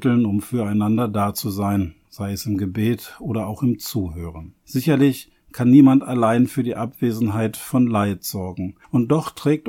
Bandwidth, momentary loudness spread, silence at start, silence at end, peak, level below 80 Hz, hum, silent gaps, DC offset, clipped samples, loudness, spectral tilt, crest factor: 17 kHz; 13 LU; 0 s; 0 s; -2 dBFS; -50 dBFS; none; none; under 0.1%; under 0.1%; -20 LUFS; -7 dB/octave; 18 dB